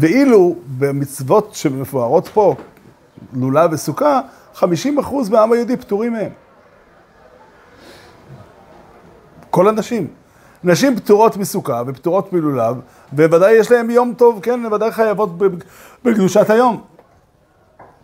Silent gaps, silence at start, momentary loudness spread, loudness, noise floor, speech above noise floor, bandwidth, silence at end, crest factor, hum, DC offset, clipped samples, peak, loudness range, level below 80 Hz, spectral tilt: none; 0 s; 11 LU; -15 LUFS; -53 dBFS; 39 dB; 16 kHz; 1.2 s; 16 dB; none; under 0.1%; under 0.1%; 0 dBFS; 8 LU; -58 dBFS; -6 dB/octave